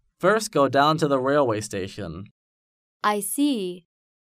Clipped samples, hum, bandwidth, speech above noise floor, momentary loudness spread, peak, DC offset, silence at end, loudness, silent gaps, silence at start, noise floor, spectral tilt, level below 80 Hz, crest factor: under 0.1%; none; 15.5 kHz; over 68 dB; 15 LU; -6 dBFS; under 0.1%; 0.4 s; -23 LUFS; 2.31-3.00 s; 0.2 s; under -90 dBFS; -4.5 dB/octave; -60 dBFS; 18 dB